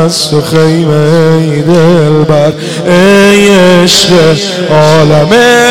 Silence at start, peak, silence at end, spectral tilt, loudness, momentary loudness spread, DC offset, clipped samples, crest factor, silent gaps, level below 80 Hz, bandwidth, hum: 0 s; 0 dBFS; 0 s; -5 dB/octave; -5 LUFS; 5 LU; 4%; 0.6%; 6 dB; none; -38 dBFS; 16.5 kHz; none